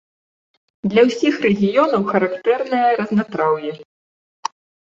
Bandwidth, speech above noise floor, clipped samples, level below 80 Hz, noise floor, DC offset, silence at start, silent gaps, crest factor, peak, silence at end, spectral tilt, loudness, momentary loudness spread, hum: 7.6 kHz; over 73 dB; under 0.1%; -62 dBFS; under -90 dBFS; under 0.1%; 0.85 s; 3.85-4.43 s; 18 dB; -2 dBFS; 0.5 s; -6.5 dB/octave; -18 LUFS; 15 LU; none